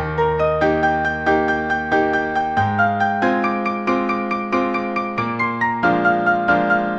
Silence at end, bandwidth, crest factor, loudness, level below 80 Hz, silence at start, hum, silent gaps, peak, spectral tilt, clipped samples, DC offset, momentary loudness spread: 0 s; 8 kHz; 14 dB; -19 LUFS; -42 dBFS; 0 s; none; none; -4 dBFS; -7 dB/octave; under 0.1%; under 0.1%; 4 LU